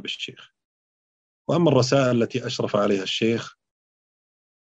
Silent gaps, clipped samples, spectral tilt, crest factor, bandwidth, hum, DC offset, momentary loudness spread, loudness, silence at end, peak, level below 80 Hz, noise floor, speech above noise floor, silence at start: 0.65-1.45 s; under 0.1%; -5.5 dB/octave; 20 dB; 8.2 kHz; none; under 0.1%; 14 LU; -22 LUFS; 1.2 s; -6 dBFS; -68 dBFS; under -90 dBFS; over 68 dB; 0.05 s